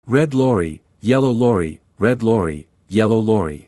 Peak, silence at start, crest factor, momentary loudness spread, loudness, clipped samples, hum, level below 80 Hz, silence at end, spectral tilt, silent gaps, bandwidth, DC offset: -2 dBFS; 0.05 s; 16 dB; 10 LU; -18 LUFS; under 0.1%; none; -46 dBFS; 0.1 s; -7.5 dB/octave; none; 12 kHz; under 0.1%